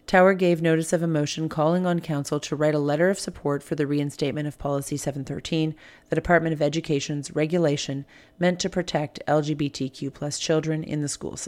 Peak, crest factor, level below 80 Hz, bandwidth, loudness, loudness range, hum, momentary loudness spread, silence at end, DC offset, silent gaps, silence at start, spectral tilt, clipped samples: -4 dBFS; 20 dB; -52 dBFS; 15.5 kHz; -25 LUFS; 3 LU; none; 8 LU; 0 s; under 0.1%; none; 0.1 s; -5.5 dB/octave; under 0.1%